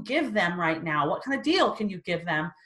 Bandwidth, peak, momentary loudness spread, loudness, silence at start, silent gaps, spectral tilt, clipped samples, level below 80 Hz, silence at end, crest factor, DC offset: 12 kHz; -10 dBFS; 6 LU; -26 LUFS; 0 s; none; -5.5 dB/octave; under 0.1%; -66 dBFS; 0.15 s; 18 dB; under 0.1%